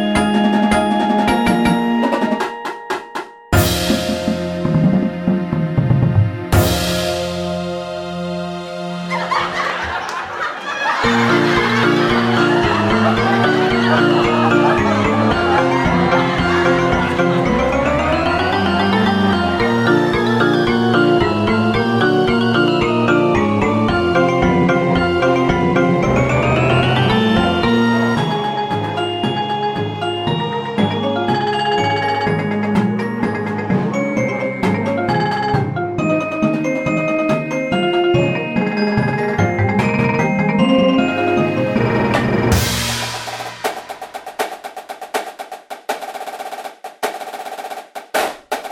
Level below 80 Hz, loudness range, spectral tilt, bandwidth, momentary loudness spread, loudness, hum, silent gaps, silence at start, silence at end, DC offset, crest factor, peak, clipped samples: -36 dBFS; 7 LU; -6 dB/octave; 16.5 kHz; 10 LU; -16 LUFS; none; none; 0 s; 0 s; under 0.1%; 14 dB; -2 dBFS; under 0.1%